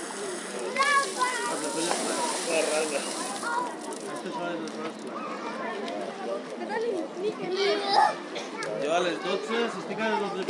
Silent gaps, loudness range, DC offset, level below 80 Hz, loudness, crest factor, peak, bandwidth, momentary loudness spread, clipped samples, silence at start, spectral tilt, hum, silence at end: none; 6 LU; under 0.1%; -86 dBFS; -29 LUFS; 20 dB; -8 dBFS; 11.5 kHz; 11 LU; under 0.1%; 0 s; -2.5 dB/octave; none; 0 s